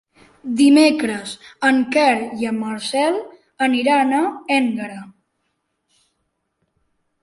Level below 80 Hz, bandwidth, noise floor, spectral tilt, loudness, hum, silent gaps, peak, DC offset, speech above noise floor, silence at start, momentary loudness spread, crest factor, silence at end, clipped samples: -64 dBFS; 11.5 kHz; -72 dBFS; -4 dB/octave; -18 LUFS; none; none; -2 dBFS; under 0.1%; 55 dB; 0.45 s; 15 LU; 16 dB; 2.1 s; under 0.1%